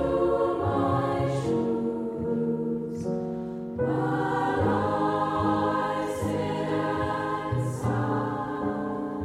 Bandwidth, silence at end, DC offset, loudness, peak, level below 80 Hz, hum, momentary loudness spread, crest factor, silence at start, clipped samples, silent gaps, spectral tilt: 14.5 kHz; 0 s; under 0.1%; -27 LUFS; -12 dBFS; -50 dBFS; none; 6 LU; 14 dB; 0 s; under 0.1%; none; -7.5 dB/octave